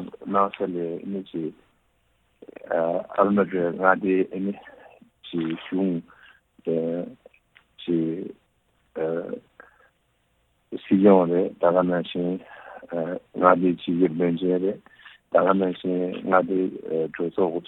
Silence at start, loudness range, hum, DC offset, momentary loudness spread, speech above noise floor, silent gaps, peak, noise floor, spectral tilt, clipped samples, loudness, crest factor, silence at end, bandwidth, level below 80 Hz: 0 s; 8 LU; none; under 0.1%; 16 LU; 45 dB; none; 0 dBFS; -68 dBFS; -10 dB/octave; under 0.1%; -24 LUFS; 24 dB; 0.05 s; 4.1 kHz; -66 dBFS